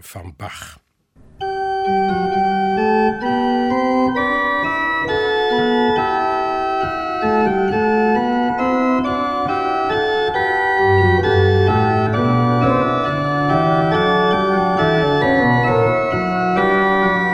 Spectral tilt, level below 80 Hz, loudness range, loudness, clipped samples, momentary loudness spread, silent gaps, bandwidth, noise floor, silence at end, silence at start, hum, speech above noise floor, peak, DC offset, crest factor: -7 dB/octave; -44 dBFS; 2 LU; -16 LUFS; under 0.1%; 5 LU; none; 13.5 kHz; -49 dBFS; 0 s; 0.05 s; none; 29 dB; -2 dBFS; under 0.1%; 14 dB